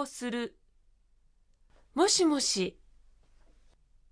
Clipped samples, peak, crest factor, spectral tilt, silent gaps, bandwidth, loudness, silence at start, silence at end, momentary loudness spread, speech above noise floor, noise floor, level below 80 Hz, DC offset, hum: under 0.1%; -14 dBFS; 20 dB; -2.5 dB/octave; none; 11 kHz; -28 LUFS; 0 s; 1.4 s; 14 LU; 36 dB; -65 dBFS; -62 dBFS; under 0.1%; none